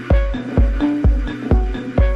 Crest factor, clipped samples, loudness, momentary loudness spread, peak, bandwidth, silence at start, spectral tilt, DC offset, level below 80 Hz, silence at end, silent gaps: 12 dB; under 0.1%; -19 LUFS; 4 LU; -2 dBFS; 5.8 kHz; 0 s; -9 dB/octave; under 0.1%; -18 dBFS; 0 s; none